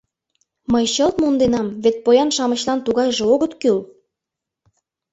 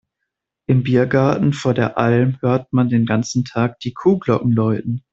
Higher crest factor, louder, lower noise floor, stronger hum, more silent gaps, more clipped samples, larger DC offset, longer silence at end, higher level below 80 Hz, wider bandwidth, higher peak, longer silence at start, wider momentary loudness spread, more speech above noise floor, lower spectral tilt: about the same, 16 dB vs 16 dB; about the same, -18 LUFS vs -18 LUFS; first, -84 dBFS vs -79 dBFS; neither; neither; neither; neither; first, 1.25 s vs 0.15 s; about the same, -50 dBFS vs -52 dBFS; about the same, 8.2 kHz vs 7.8 kHz; about the same, -2 dBFS vs -2 dBFS; about the same, 0.7 s vs 0.7 s; about the same, 5 LU vs 5 LU; first, 67 dB vs 62 dB; second, -4 dB/octave vs -7.5 dB/octave